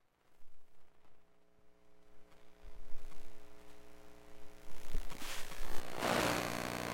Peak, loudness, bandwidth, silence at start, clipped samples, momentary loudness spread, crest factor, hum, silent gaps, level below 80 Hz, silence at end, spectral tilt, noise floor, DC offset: -20 dBFS; -39 LUFS; 17 kHz; 0.3 s; under 0.1%; 27 LU; 16 dB; none; none; -48 dBFS; 0 s; -3.5 dB/octave; -61 dBFS; under 0.1%